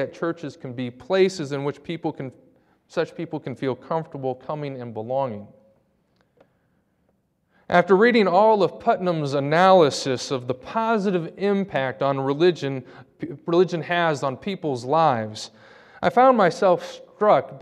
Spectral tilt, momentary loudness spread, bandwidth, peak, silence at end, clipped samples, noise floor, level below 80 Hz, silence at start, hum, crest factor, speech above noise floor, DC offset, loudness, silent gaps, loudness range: -6 dB/octave; 16 LU; 11 kHz; -2 dBFS; 0 s; under 0.1%; -68 dBFS; -66 dBFS; 0 s; none; 20 dB; 46 dB; under 0.1%; -22 LUFS; none; 11 LU